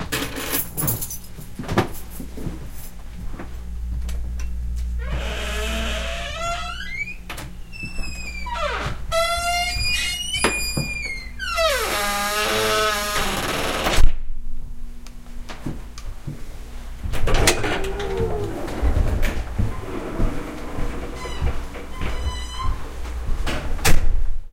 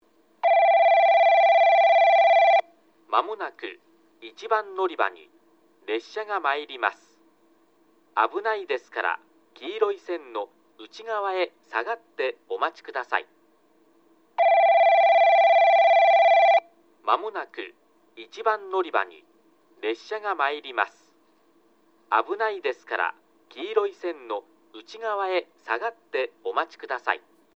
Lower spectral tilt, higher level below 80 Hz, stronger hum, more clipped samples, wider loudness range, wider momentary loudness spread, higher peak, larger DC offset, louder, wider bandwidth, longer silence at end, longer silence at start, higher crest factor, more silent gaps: first, -3.5 dB/octave vs -2 dB/octave; first, -26 dBFS vs -88 dBFS; neither; neither; about the same, 9 LU vs 11 LU; about the same, 16 LU vs 17 LU; first, 0 dBFS vs -6 dBFS; first, 0.9% vs under 0.1%; about the same, -24 LUFS vs -23 LUFS; first, 16.5 kHz vs 6.6 kHz; second, 0 s vs 0.4 s; second, 0 s vs 0.45 s; about the same, 22 dB vs 18 dB; neither